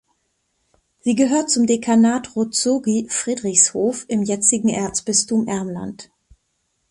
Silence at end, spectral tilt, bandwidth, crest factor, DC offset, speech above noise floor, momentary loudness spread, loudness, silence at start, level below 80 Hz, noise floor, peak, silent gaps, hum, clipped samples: 0.85 s; -3.5 dB/octave; 11.5 kHz; 20 dB; under 0.1%; 52 dB; 10 LU; -18 LUFS; 1.05 s; -58 dBFS; -70 dBFS; 0 dBFS; none; none; under 0.1%